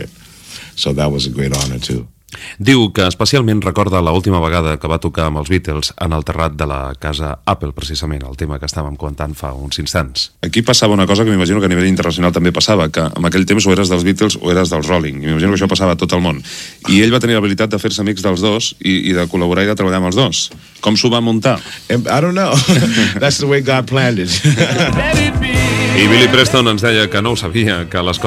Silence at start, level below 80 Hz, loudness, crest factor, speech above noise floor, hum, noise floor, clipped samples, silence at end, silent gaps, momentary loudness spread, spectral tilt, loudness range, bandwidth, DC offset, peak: 0 s; -30 dBFS; -14 LUFS; 14 dB; 23 dB; none; -37 dBFS; under 0.1%; 0 s; none; 10 LU; -4.5 dB/octave; 7 LU; 15.5 kHz; under 0.1%; 0 dBFS